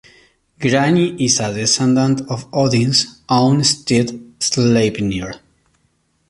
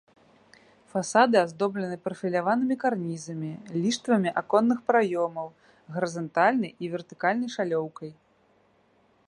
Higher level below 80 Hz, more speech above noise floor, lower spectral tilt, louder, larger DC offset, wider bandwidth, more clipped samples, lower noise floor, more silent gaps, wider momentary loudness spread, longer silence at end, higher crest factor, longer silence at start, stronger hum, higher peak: first, -48 dBFS vs -76 dBFS; first, 47 dB vs 38 dB; about the same, -4.5 dB/octave vs -5.5 dB/octave; first, -16 LUFS vs -26 LUFS; neither; about the same, 11.5 kHz vs 11 kHz; neither; about the same, -63 dBFS vs -64 dBFS; neither; second, 9 LU vs 12 LU; second, 0.9 s vs 1.15 s; second, 16 dB vs 22 dB; second, 0.6 s vs 0.95 s; neither; first, -2 dBFS vs -6 dBFS